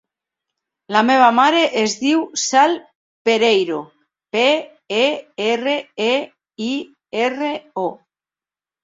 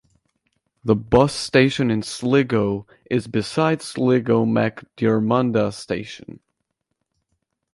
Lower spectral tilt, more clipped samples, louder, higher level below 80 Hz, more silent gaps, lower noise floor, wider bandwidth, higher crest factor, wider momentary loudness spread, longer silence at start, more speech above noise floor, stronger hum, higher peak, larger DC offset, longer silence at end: second, -2.5 dB/octave vs -6 dB/octave; neither; about the same, -18 LUFS vs -20 LUFS; second, -68 dBFS vs -48 dBFS; first, 2.95-3.25 s vs none; first, under -90 dBFS vs -77 dBFS; second, 7.8 kHz vs 11.5 kHz; about the same, 18 dB vs 20 dB; about the same, 12 LU vs 11 LU; about the same, 0.9 s vs 0.85 s; first, over 73 dB vs 57 dB; neither; about the same, -2 dBFS vs -2 dBFS; neither; second, 0.9 s vs 1.4 s